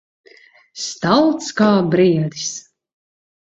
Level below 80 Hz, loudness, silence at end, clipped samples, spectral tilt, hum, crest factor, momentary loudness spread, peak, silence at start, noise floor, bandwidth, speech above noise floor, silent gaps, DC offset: -58 dBFS; -17 LUFS; 0.85 s; under 0.1%; -5 dB/octave; none; 18 dB; 13 LU; -2 dBFS; 0.75 s; -49 dBFS; 8 kHz; 33 dB; none; under 0.1%